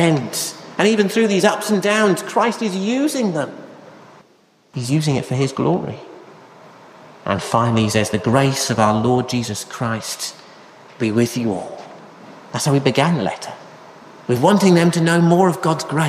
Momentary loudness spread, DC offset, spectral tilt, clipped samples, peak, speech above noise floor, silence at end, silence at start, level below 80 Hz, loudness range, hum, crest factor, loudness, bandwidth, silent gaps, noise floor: 15 LU; under 0.1%; -5.5 dB/octave; under 0.1%; -2 dBFS; 38 dB; 0 s; 0 s; -56 dBFS; 6 LU; none; 18 dB; -18 LUFS; 15.5 kHz; none; -55 dBFS